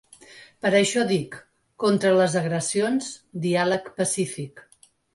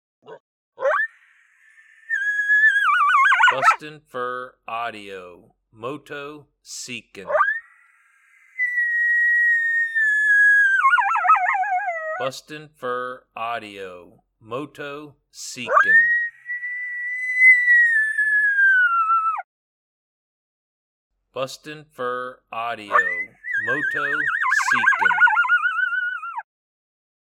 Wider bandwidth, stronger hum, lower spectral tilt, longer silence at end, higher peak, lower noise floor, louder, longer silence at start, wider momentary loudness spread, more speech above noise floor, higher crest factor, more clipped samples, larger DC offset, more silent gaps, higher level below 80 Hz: second, 11.5 kHz vs 15.5 kHz; neither; first, -4.5 dB/octave vs -2 dB/octave; second, 0.55 s vs 0.85 s; second, -8 dBFS vs -4 dBFS; second, -49 dBFS vs -57 dBFS; second, -23 LUFS vs -18 LUFS; about the same, 0.3 s vs 0.3 s; second, 15 LU vs 20 LU; second, 26 dB vs 34 dB; about the same, 16 dB vs 18 dB; neither; neither; second, none vs 0.40-0.72 s, 19.44-21.10 s; first, -66 dBFS vs -72 dBFS